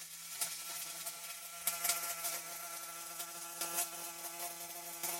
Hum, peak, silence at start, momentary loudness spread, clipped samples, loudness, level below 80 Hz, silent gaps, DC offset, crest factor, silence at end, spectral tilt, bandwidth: none; -20 dBFS; 0 s; 9 LU; under 0.1%; -39 LUFS; -80 dBFS; none; under 0.1%; 24 dB; 0 s; 0.5 dB/octave; 17 kHz